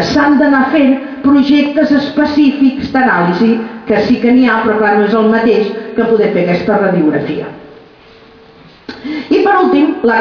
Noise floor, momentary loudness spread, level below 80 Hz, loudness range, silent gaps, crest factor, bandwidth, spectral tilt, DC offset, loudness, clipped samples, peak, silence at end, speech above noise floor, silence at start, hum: -40 dBFS; 8 LU; -46 dBFS; 5 LU; none; 10 dB; 5.4 kHz; -7 dB/octave; under 0.1%; -11 LUFS; under 0.1%; 0 dBFS; 0 s; 30 dB; 0 s; none